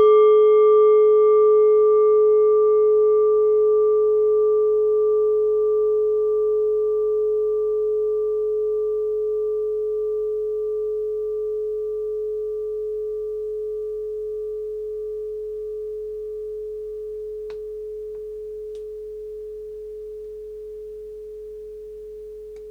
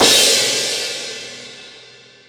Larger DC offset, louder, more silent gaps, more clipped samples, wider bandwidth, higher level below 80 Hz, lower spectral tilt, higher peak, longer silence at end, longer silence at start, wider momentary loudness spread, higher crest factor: neither; second, -20 LUFS vs -14 LUFS; neither; neither; second, 3.4 kHz vs over 20 kHz; about the same, -54 dBFS vs -58 dBFS; first, -7 dB/octave vs 0 dB/octave; second, -8 dBFS vs -2 dBFS; second, 0 s vs 0.5 s; about the same, 0 s vs 0 s; second, 20 LU vs 24 LU; about the same, 12 dB vs 16 dB